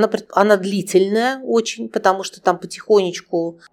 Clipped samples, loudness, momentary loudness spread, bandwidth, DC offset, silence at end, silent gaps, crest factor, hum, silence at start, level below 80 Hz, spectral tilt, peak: under 0.1%; -18 LUFS; 8 LU; 16 kHz; under 0.1%; 0.2 s; none; 18 dB; none; 0 s; -70 dBFS; -4.5 dB/octave; 0 dBFS